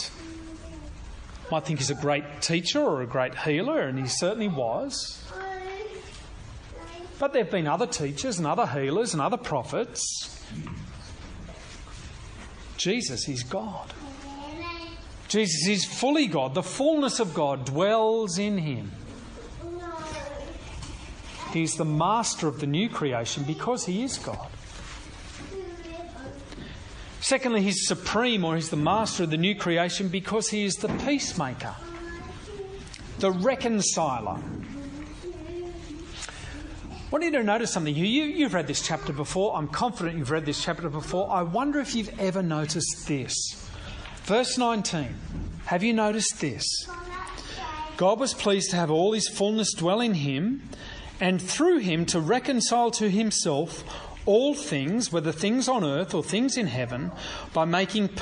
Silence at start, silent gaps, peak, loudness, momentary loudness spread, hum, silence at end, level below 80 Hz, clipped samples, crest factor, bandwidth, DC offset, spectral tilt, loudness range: 0 s; none; -10 dBFS; -27 LUFS; 17 LU; none; 0 s; -48 dBFS; under 0.1%; 18 dB; 10 kHz; under 0.1%; -4 dB/octave; 8 LU